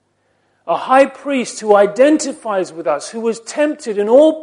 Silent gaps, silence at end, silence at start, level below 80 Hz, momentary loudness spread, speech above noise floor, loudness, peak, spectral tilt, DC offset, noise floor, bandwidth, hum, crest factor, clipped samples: none; 0 s; 0.65 s; -68 dBFS; 10 LU; 47 dB; -15 LUFS; 0 dBFS; -4 dB/octave; under 0.1%; -62 dBFS; 11.5 kHz; none; 16 dB; under 0.1%